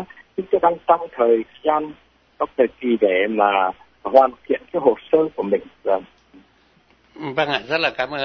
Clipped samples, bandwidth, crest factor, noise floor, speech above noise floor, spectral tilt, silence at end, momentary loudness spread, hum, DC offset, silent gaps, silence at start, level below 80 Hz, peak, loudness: under 0.1%; 6.4 kHz; 20 dB; -57 dBFS; 38 dB; -6.5 dB/octave; 0 s; 9 LU; none; under 0.1%; none; 0 s; -60 dBFS; 0 dBFS; -20 LUFS